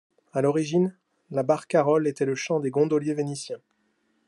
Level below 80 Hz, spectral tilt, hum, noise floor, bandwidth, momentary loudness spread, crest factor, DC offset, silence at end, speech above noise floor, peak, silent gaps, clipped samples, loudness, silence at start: -74 dBFS; -6.5 dB/octave; none; -70 dBFS; 11.5 kHz; 10 LU; 18 dB; under 0.1%; 0.7 s; 46 dB; -8 dBFS; none; under 0.1%; -25 LUFS; 0.35 s